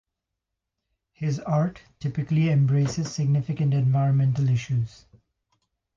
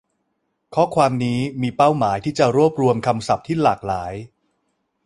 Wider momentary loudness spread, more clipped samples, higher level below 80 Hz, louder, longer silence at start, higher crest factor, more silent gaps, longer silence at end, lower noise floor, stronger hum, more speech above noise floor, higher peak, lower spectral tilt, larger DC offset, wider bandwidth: about the same, 9 LU vs 9 LU; neither; about the same, -56 dBFS vs -52 dBFS; second, -24 LUFS vs -19 LUFS; first, 1.2 s vs 0.7 s; second, 12 dB vs 18 dB; neither; first, 1.1 s vs 0.8 s; first, -84 dBFS vs -72 dBFS; neither; first, 61 dB vs 53 dB; second, -12 dBFS vs -2 dBFS; about the same, -7.5 dB/octave vs -6.5 dB/octave; neither; second, 7.4 kHz vs 11.5 kHz